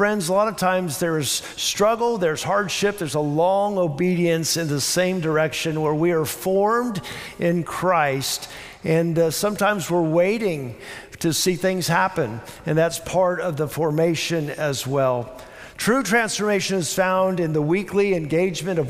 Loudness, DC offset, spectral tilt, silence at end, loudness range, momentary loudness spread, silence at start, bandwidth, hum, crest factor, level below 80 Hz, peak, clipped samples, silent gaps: -21 LUFS; under 0.1%; -4.5 dB/octave; 0 s; 2 LU; 6 LU; 0 s; 16 kHz; none; 16 dB; -54 dBFS; -6 dBFS; under 0.1%; none